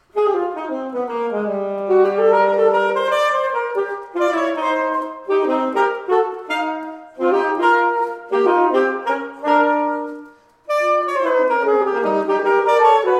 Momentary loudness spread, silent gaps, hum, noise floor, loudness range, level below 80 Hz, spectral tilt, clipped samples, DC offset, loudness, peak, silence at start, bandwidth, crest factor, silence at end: 9 LU; none; none; -42 dBFS; 2 LU; -70 dBFS; -5 dB/octave; under 0.1%; under 0.1%; -18 LUFS; -2 dBFS; 0.15 s; 12.5 kHz; 16 dB; 0 s